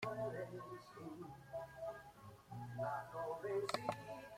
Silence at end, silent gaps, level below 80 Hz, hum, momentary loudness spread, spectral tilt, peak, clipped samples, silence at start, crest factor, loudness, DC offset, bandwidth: 0 s; none; -74 dBFS; none; 12 LU; -5.5 dB/octave; -22 dBFS; under 0.1%; 0 s; 24 dB; -47 LUFS; under 0.1%; 16.5 kHz